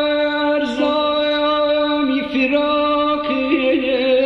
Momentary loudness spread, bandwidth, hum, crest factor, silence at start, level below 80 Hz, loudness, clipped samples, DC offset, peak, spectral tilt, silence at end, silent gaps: 2 LU; 8 kHz; none; 14 dB; 0 s; -50 dBFS; -17 LUFS; under 0.1%; under 0.1%; -4 dBFS; -5 dB/octave; 0 s; none